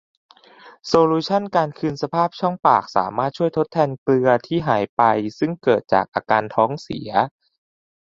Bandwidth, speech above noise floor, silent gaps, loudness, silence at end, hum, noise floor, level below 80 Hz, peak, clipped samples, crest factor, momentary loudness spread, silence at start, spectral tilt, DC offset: 7.6 kHz; 28 dB; 3.98-4.06 s, 4.89-4.97 s, 6.08-6.12 s; -20 LUFS; 0.9 s; none; -47 dBFS; -58 dBFS; -2 dBFS; under 0.1%; 18 dB; 6 LU; 0.65 s; -6.5 dB/octave; under 0.1%